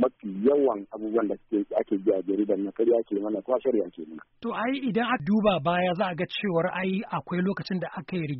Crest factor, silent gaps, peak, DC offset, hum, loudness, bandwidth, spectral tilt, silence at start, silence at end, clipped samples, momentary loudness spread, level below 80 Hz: 16 dB; none; -12 dBFS; under 0.1%; none; -27 LUFS; 5.6 kHz; -5 dB/octave; 0 s; 0 s; under 0.1%; 9 LU; -62 dBFS